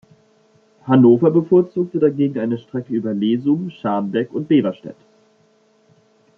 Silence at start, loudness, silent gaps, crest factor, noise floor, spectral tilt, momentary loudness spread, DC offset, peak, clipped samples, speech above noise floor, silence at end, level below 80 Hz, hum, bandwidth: 0.85 s; -18 LUFS; none; 16 dB; -57 dBFS; -10 dB/octave; 13 LU; under 0.1%; -2 dBFS; under 0.1%; 40 dB; 1.45 s; -64 dBFS; none; 4 kHz